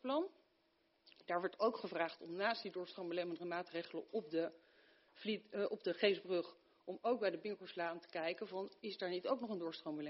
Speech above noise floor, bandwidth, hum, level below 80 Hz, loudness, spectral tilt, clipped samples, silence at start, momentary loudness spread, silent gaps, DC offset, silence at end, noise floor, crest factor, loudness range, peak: 37 dB; 5.8 kHz; none; under -90 dBFS; -42 LUFS; -2.5 dB/octave; under 0.1%; 0.05 s; 9 LU; none; under 0.1%; 0 s; -78 dBFS; 22 dB; 3 LU; -20 dBFS